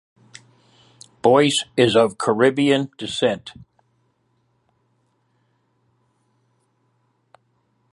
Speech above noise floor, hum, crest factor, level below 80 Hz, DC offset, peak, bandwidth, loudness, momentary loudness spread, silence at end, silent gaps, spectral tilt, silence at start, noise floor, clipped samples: 48 dB; none; 20 dB; -62 dBFS; under 0.1%; -2 dBFS; 11.5 kHz; -18 LUFS; 9 LU; 4.45 s; none; -4.5 dB/octave; 1.25 s; -67 dBFS; under 0.1%